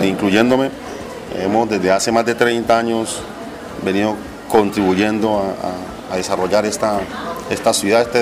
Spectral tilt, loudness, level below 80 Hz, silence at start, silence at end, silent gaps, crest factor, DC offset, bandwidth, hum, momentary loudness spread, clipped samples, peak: -4.5 dB/octave; -17 LUFS; -46 dBFS; 0 s; 0 s; none; 16 dB; under 0.1%; 15.5 kHz; none; 13 LU; under 0.1%; -2 dBFS